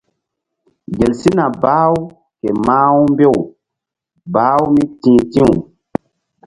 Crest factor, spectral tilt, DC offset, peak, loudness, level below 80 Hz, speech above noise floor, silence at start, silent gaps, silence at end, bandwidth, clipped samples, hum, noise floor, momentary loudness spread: 14 dB; -8 dB/octave; under 0.1%; 0 dBFS; -13 LUFS; -42 dBFS; 70 dB; 0.9 s; none; 0.85 s; 11.5 kHz; under 0.1%; none; -82 dBFS; 15 LU